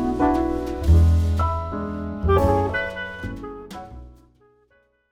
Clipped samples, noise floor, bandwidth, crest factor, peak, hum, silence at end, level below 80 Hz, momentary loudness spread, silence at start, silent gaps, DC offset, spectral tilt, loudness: under 0.1%; -62 dBFS; 9.4 kHz; 16 dB; -6 dBFS; none; 1 s; -28 dBFS; 19 LU; 0 s; none; under 0.1%; -8 dB/octave; -22 LUFS